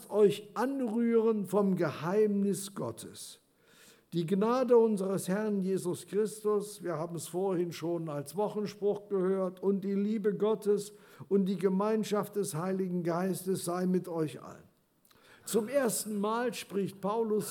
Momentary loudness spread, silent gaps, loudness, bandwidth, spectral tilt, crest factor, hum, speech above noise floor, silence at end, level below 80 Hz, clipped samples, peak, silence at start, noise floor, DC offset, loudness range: 9 LU; none; -31 LUFS; 18 kHz; -6 dB/octave; 18 dB; none; 36 dB; 0 s; -84 dBFS; under 0.1%; -14 dBFS; 0 s; -67 dBFS; under 0.1%; 3 LU